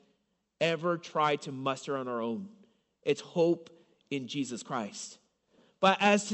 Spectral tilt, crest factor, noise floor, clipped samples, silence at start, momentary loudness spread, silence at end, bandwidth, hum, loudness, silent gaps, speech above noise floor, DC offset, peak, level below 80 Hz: -4.5 dB/octave; 22 dB; -76 dBFS; under 0.1%; 0.6 s; 13 LU; 0 s; 8.4 kHz; none; -31 LUFS; none; 46 dB; under 0.1%; -10 dBFS; -82 dBFS